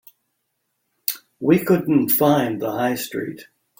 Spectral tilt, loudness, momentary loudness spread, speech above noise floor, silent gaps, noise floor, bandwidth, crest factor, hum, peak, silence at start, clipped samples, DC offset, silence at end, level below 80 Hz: -6 dB/octave; -20 LUFS; 11 LU; 55 dB; none; -74 dBFS; 17 kHz; 18 dB; none; -2 dBFS; 1.1 s; under 0.1%; under 0.1%; 0.35 s; -60 dBFS